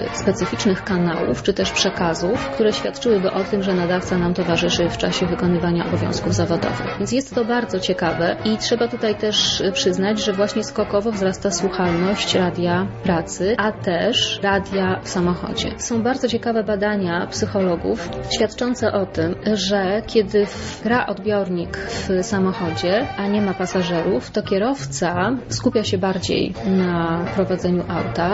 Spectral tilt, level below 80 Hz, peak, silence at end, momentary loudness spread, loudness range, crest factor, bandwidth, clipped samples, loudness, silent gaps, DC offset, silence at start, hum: -5 dB/octave; -42 dBFS; -4 dBFS; 0 s; 4 LU; 2 LU; 16 dB; 8 kHz; under 0.1%; -20 LUFS; none; under 0.1%; 0 s; none